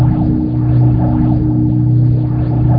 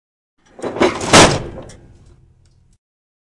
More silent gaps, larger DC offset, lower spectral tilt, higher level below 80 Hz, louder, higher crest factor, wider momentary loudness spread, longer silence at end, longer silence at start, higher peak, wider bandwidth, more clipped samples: neither; neither; first, -13.5 dB/octave vs -3 dB/octave; first, -24 dBFS vs -38 dBFS; about the same, -13 LUFS vs -12 LUFS; second, 10 dB vs 18 dB; second, 3 LU vs 23 LU; second, 0 s vs 1.75 s; second, 0 s vs 0.6 s; about the same, 0 dBFS vs 0 dBFS; second, 2.3 kHz vs 12 kHz; second, under 0.1% vs 0.2%